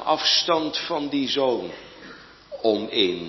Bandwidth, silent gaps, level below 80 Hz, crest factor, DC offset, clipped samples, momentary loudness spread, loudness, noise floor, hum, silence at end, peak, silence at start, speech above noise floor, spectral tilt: 6.2 kHz; none; -60 dBFS; 18 dB; under 0.1%; under 0.1%; 23 LU; -22 LUFS; -45 dBFS; none; 0 s; -6 dBFS; 0 s; 22 dB; -3 dB/octave